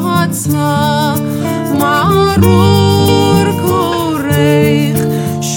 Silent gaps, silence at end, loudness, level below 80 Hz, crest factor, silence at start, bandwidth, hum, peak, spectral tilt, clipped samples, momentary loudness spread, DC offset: none; 0 s; -11 LUFS; -38 dBFS; 10 dB; 0 s; 19 kHz; none; 0 dBFS; -5.5 dB/octave; under 0.1%; 6 LU; under 0.1%